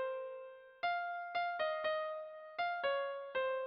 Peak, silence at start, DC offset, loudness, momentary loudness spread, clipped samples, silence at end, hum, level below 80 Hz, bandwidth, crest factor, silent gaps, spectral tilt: -26 dBFS; 0 s; under 0.1%; -39 LUFS; 10 LU; under 0.1%; 0 s; none; -84 dBFS; 6 kHz; 12 dB; none; 2 dB/octave